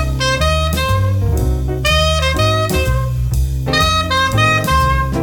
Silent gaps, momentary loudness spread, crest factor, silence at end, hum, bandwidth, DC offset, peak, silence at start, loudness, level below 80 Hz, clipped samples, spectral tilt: none; 5 LU; 14 dB; 0 s; none; 19 kHz; 0.1%; -2 dBFS; 0 s; -15 LUFS; -20 dBFS; under 0.1%; -4.5 dB/octave